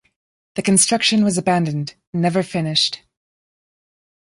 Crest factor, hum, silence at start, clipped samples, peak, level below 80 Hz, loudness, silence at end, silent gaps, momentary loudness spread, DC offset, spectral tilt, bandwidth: 18 dB; none; 0.55 s; under 0.1%; -2 dBFS; -60 dBFS; -18 LUFS; 1.3 s; 2.07-2.13 s; 13 LU; under 0.1%; -3.5 dB/octave; 11.5 kHz